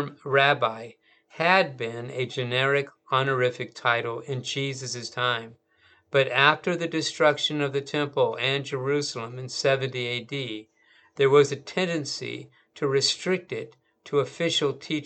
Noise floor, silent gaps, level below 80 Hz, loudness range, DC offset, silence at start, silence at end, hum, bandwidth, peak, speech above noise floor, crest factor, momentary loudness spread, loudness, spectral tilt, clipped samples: -61 dBFS; none; -76 dBFS; 3 LU; under 0.1%; 0 s; 0 s; none; 9 kHz; -2 dBFS; 36 dB; 24 dB; 12 LU; -25 LUFS; -4 dB/octave; under 0.1%